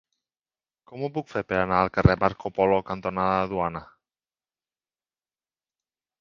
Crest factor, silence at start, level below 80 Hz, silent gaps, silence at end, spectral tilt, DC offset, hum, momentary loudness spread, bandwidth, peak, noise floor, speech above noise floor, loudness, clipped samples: 24 dB; 0.9 s; -44 dBFS; none; 2.35 s; -8.5 dB/octave; under 0.1%; none; 11 LU; 7.2 kHz; -2 dBFS; under -90 dBFS; over 66 dB; -25 LUFS; under 0.1%